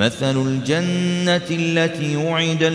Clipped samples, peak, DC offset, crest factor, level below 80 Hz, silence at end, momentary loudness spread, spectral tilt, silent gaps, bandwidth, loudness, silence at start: under 0.1%; -2 dBFS; under 0.1%; 16 dB; -58 dBFS; 0 s; 2 LU; -5.5 dB/octave; none; 11 kHz; -19 LUFS; 0 s